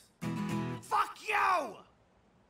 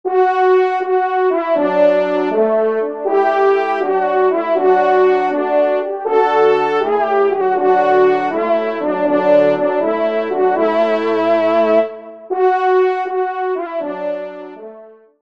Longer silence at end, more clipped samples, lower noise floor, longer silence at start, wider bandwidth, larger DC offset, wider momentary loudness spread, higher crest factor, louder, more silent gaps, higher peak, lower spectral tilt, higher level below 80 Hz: first, 0.65 s vs 0.45 s; neither; first, -66 dBFS vs -40 dBFS; first, 0.2 s vs 0.05 s; first, 16 kHz vs 6.2 kHz; second, under 0.1% vs 0.3%; about the same, 10 LU vs 8 LU; about the same, 16 dB vs 14 dB; second, -33 LUFS vs -15 LUFS; neither; second, -18 dBFS vs 0 dBFS; second, -5 dB/octave vs -6.5 dB/octave; about the same, -68 dBFS vs -70 dBFS